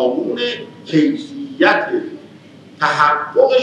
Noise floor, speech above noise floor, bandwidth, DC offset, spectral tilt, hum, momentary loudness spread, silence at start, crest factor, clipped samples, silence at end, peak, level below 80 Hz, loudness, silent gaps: -41 dBFS; 25 dB; 9.6 kHz; under 0.1%; -5.5 dB/octave; none; 15 LU; 0 s; 16 dB; under 0.1%; 0 s; 0 dBFS; -88 dBFS; -16 LUFS; none